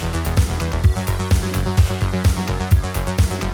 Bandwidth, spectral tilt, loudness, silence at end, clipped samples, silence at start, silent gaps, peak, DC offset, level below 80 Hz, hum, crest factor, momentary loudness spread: 18 kHz; -5.5 dB/octave; -20 LUFS; 0 s; under 0.1%; 0 s; none; -4 dBFS; under 0.1%; -22 dBFS; none; 14 dB; 3 LU